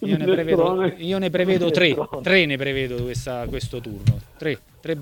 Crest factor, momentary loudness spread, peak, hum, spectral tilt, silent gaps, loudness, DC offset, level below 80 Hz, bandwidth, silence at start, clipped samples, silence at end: 20 dB; 11 LU; -2 dBFS; none; -6 dB/octave; none; -22 LUFS; under 0.1%; -44 dBFS; 18 kHz; 0 s; under 0.1%; 0 s